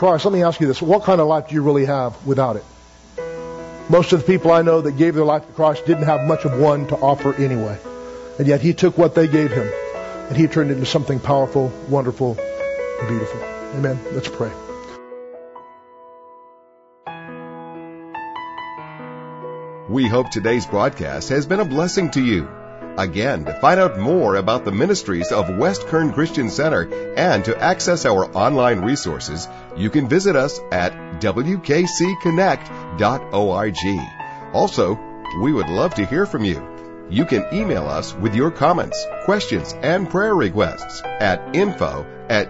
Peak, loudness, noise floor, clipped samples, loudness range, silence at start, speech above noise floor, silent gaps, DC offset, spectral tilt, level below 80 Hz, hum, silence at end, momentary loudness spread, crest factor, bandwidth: 0 dBFS; -19 LUFS; -51 dBFS; under 0.1%; 10 LU; 0 s; 34 dB; none; under 0.1%; -6 dB/octave; -46 dBFS; none; 0 s; 17 LU; 18 dB; 8 kHz